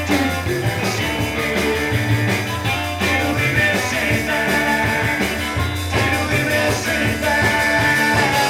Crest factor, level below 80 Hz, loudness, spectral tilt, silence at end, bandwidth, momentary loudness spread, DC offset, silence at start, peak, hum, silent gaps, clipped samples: 14 dB; -36 dBFS; -18 LUFS; -4.5 dB/octave; 0 s; 18 kHz; 5 LU; under 0.1%; 0 s; -4 dBFS; none; none; under 0.1%